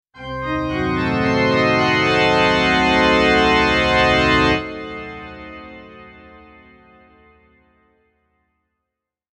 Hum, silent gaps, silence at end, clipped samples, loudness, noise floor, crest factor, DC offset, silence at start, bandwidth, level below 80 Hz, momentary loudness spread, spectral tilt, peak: none; none; 3.3 s; under 0.1%; -16 LUFS; -82 dBFS; 16 dB; under 0.1%; 0.15 s; 11 kHz; -38 dBFS; 19 LU; -5 dB/octave; -2 dBFS